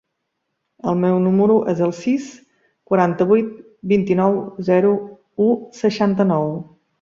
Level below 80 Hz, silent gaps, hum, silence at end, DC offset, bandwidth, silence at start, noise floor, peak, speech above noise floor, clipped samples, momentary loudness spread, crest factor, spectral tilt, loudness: -60 dBFS; none; none; 0.4 s; under 0.1%; 7.4 kHz; 0.85 s; -75 dBFS; -2 dBFS; 58 dB; under 0.1%; 11 LU; 16 dB; -8 dB/octave; -18 LUFS